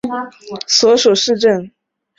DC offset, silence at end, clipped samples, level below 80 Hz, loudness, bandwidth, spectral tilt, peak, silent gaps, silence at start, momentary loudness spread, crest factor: under 0.1%; 0.5 s; under 0.1%; -58 dBFS; -13 LUFS; 7.8 kHz; -2.5 dB/octave; 0 dBFS; none; 0.05 s; 16 LU; 16 dB